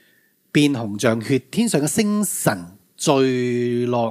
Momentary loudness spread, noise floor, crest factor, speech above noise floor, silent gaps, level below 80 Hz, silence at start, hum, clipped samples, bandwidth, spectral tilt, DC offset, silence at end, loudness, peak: 4 LU; -60 dBFS; 18 dB; 40 dB; none; -64 dBFS; 0.55 s; none; under 0.1%; 16 kHz; -5 dB/octave; under 0.1%; 0 s; -20 LUFS; -2 dBFS